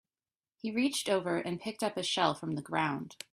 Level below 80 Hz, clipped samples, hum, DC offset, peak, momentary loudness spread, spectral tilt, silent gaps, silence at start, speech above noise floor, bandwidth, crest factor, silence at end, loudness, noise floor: -74 dBFS; under 0.1%; none; under 0.1%; -12 dBFS; 8 LU; -4 dB/octave; none; 0.65 s; over 57 dB; 14 kHz; 22 dB; 0.2 s; -33 LUFS; under -90 dBFS